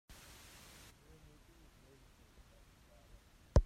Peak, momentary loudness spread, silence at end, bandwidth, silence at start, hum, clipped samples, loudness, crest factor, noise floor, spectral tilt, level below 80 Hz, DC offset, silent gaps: -16 dBFS; 8 LU; 0 s; 15 kHz; 3.55 s; none; under 0.1%; -46 LUFS; 26 dB; -64 dBFS; -6.5 dB/octave; -44 dBFS; under 0.1%; none